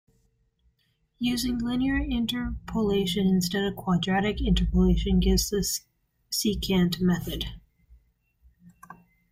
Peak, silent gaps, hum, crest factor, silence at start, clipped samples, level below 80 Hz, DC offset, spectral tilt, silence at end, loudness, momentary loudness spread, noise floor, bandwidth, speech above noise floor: -10 dBFS; none; none; 16 dB; 1.2 s; under 0.1%; -36 dBFS; under 0.1%; -5 dB/octave; 0.4 s; -26 LUFS; 8 LU; -71 dBFS; 16 kHz; 46 dB